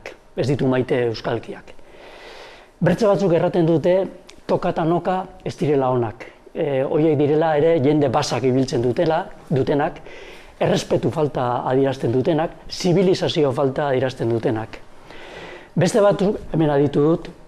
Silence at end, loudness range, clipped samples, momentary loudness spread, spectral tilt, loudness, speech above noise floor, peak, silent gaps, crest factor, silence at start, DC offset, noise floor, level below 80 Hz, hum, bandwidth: 0 s; 3 LU; under 0.1%; 19 LU; -6.5 dB/octave; -20 LUFS; 23 dB; -6 dBFS; none; 14 dB; 0.05 s; under 0.1%; -42 dBFS; -46 dBFS; none; 13 kHz